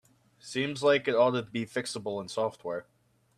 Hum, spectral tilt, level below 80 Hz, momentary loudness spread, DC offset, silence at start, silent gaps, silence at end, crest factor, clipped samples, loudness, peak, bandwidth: none; -4.5 dB/octave; -72 dBFS; 12 LU; under 0.1%; 0.45 s; none; 0.55 s; 20 dB; under 0.1%; -30 LUFS; -12 dBFS; 13 kHz